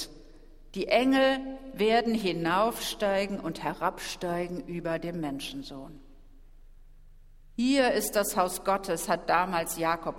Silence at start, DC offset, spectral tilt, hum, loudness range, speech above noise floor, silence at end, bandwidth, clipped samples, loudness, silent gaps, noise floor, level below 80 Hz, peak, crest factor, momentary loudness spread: 0 s; under 0.1%; -4 dB/octave; none; 9 LU; 23 dB; 0 s; 16 kHz; under 0.1%; -28 LUFS; none; -51 dBFS; -52 dBFS; -10 dBFS; 20 dB; 13 LU